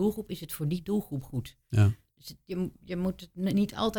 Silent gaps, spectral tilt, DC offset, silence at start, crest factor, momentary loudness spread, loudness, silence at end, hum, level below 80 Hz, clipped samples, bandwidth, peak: none; -7 dB/octave; under 0.1%; 0 s; 18 dB; 12 LU; -31 LUFS; 0 s; none; -54 dBFS; under 0.1%; 19 kHz; -12 dBFS